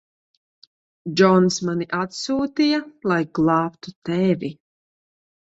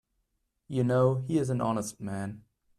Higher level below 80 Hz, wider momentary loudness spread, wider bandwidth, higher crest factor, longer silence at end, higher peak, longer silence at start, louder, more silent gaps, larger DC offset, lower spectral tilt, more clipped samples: about the same, -62 dBFS vs -64 dBFS; about the same, 12 LU vs 12 LU; second, 8 kHz vs 14 kHz; about the same, 20 dB vs 18 dB; first, 0.9 s vs 0.4 s; first, -2 dBFS vs -12 dBFS; first, 1.05 s vs 0.7 s; first, -21 LUFS vs -29 LUFS; first, 3.96-4.02 s vs none; neither; second, -5.5 dB/octave vs -7.5 dB/octave; neither